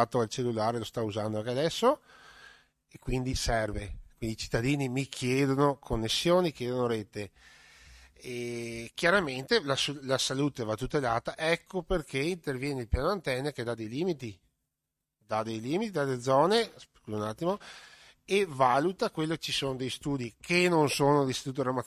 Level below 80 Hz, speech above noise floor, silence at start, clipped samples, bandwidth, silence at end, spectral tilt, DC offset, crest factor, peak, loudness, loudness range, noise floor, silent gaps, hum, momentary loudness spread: -48 dBFS; 56 dB; 0 s; under 0.1%; 15 kHz; 0 s; -5 dB/octave; under 0.1%; 20 dB; -10 dBFS; -30 LUFS; 4 LU; -86 dBFS; none; none; 12 LU